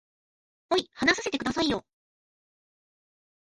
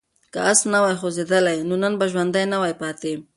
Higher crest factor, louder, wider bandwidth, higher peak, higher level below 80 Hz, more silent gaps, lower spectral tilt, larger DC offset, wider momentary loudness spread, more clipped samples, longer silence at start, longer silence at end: first, 24 dB vs 18 dB; second, -27 LUFS vs -20 LUFS; about the same, 11.5 kHz vs 11.5 kHz; second, -8 dBFS vs -2 dBFS; first, -58 dBFS vs -66 dBFS; neither; about the same, -3 dB/octave vs -3.5 dB/octave; neither; second, 5 LU vs 10 LU; neither; first, 0.7 s vs 0.35 s; first, 1.6 s vs 0.15 s